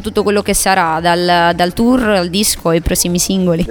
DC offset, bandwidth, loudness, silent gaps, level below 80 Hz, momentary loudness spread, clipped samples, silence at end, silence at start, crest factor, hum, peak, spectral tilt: under 0.1%; 19 kHz; -13 LUFS; none; -30 dBFS; 3 LU; under 0.1%; 0 s; 0 s; 12 dB; none; 0 dBFS; -4 dB/octave